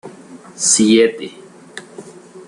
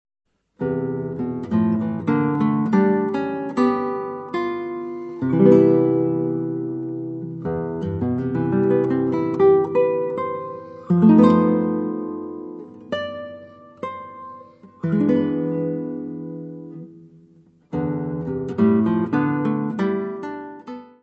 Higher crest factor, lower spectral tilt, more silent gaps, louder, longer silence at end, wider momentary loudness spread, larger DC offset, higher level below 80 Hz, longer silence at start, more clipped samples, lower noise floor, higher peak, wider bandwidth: about the same, 16 dB vs 20 dB; second, -2.5 dB/octave vs -10 dB/octave; neither; first, -13 LUFS vs -21 LUFS; about the same, 0.05 s vs 0.15 s; first, 25 LU vs 18 LU; neither; about the same, -60 dBFS vs -58 dBFS; second, 0.05 s vs 0.6 s; neither; second, -38 dBFS vs -53 dBFS; about the same, -2 dBFS vs -2 dBFS; first, 12 kHz vs 6.2 kHz